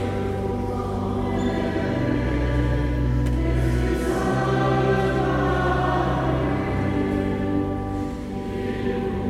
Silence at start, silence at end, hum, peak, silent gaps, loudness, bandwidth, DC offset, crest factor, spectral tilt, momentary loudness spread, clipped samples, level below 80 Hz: 0 s; 0 s; none; -8 dBFS; none; -23 LUFS; 13 kHz; under 0.1%; 14 dB; -7.5 dB/octave; 5 LU; under 0.1%; -30 dBFS